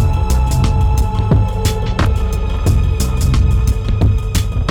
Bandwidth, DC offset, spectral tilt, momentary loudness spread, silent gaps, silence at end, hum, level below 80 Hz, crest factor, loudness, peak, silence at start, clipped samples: 18 kHz; under 0.1%; -6 dB/octave; 3 LU; none; 0 s; none; -16 dBFS; 10 dB; -16 LUFS; -4 dBFS; 0 s; under 0.1%